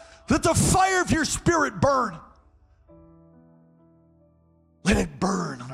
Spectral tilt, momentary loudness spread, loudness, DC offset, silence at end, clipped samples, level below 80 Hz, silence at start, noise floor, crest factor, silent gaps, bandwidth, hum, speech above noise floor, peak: -4.5 dB/octave; 9 LU; -23 LUFS; under 0.1%; 0 s; under 0.1%; -42 dBFS; 0 s; -61 dBFS; 16 dB; none; 16 kHz; none; 38 dB; -10 dBFS